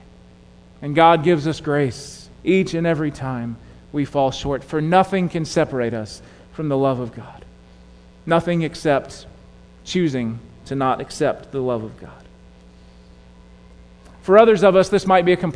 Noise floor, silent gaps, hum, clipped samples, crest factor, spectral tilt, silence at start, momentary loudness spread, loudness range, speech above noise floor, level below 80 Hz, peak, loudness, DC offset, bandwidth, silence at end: -47 dBFS; none; none; under 0.1%; 20 dB; -6.5 dB/octave; 0.8 s; 21 LU; 6 LU; 28 dB; -46 dBFS; 0 dBFS; -19 LUFS; under 0.1%; 11 kHz; 0 s